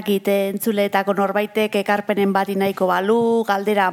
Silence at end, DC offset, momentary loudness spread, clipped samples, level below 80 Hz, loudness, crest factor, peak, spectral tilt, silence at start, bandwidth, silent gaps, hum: 0 s; under 0.1%; 3 LU; under 0.1%; -74 dBFS; -19 LUFS; 16 dB; -2 dBFS; -5.5 dB/octave; 0 s; 17 kHz; none; none